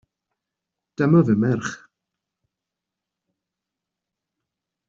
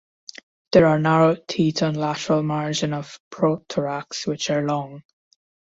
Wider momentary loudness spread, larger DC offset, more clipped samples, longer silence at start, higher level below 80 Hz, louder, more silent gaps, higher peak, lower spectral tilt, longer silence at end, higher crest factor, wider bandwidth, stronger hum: about the same, 16 LU vs 16 LU; neither; neither; first, 1 s vs 0.7 s; about the same, -62 dBFS vs -58 dBFS; about the same, -19 LUFS vs -21 LUFS; second, none vs 3.20-3.31 s; second, -6 dBFS vs -2 dBFS; first, -8.5 dB/octave vs -5.5 dB/octave; first, 3.15 s vs 0.75 s; about the same, 20 dB vs 20 dB; about the same, 7.6 kHz vs 7.8 kHz; neither